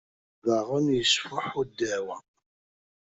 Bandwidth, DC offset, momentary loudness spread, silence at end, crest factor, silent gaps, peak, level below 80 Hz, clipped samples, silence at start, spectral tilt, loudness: 8.2 kHz; under 0.1%; 10 LU; 0.9 s; 20 dB; none; -10 dBFS; -62 dBFS; under 0.1%; 0.45 s; -3.5 dB/octave; -27 LUFS